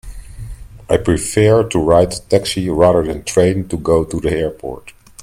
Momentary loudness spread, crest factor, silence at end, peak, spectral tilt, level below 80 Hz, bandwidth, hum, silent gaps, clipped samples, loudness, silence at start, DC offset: 19 LU; 16 dB; 0.35 s; 0 dBFS; -5.5 dB/octave; -34 dBFS; 16 kHz; none; none; under 0.1%; -15 LUFS; 0.05 s; under 0.1%